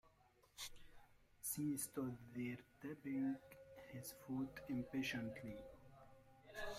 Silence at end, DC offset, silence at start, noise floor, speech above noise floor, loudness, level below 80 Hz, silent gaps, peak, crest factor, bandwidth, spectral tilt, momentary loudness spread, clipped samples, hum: 0 s; under 0.1%; 0.05 s; -74 dBFS; 27 dB; -48 LUFS; -70 dBFS; none; -32 dBFS; 16 dB; 16 kHz; -4.5 dB/octave; 20 LU; under 0.1%; none